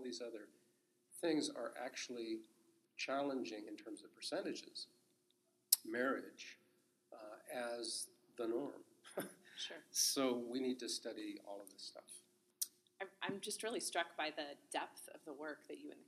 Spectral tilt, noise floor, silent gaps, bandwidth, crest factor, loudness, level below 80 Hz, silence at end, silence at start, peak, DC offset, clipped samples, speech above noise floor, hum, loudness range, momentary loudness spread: -1.5 dB/octave; -80 dBFS; none; 14.5 kHz; 36 dB; -43 LUFS; under -90 dBFS; 0.05 s; 0 s; -10 dBFS; under 0.1%; under 0.1%; 35 dB; none; 5 LU; 18 LU